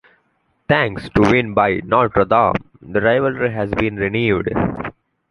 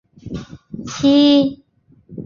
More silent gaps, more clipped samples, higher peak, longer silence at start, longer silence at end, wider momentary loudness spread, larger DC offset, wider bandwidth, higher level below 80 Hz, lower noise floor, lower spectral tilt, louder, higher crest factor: neither; neither; about the same, -2 dBFS vs -4 dBFS; first, 0.7 s vs 0.25 s; first, 0.4 s vs 0 s; second, 8 LU vs 22 LU; neither; first, 11 kHz vs 7.4 kHz; first, -40 dBFS vs -48 dBFS; first, -64 dBFS vs -46 dBFS; first, -7.5 dB/octave vs -5.5 dB/octave; second, -17 LUFS vs -14 LUFS; about the same, 16 dB vs 14 dB